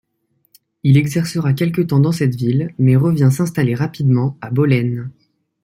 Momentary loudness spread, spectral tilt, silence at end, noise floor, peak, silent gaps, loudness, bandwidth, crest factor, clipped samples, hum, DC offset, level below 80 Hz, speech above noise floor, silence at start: 6 LU; -7.5 dB/octave; 0.55 s; -65 dBFS; -2 dBFS; none; -16 LUFS; 15.5 kHz; 14 dB; under 0.1%; none; under 0.1%; -54 dBFS; 50 dB; 0.85 s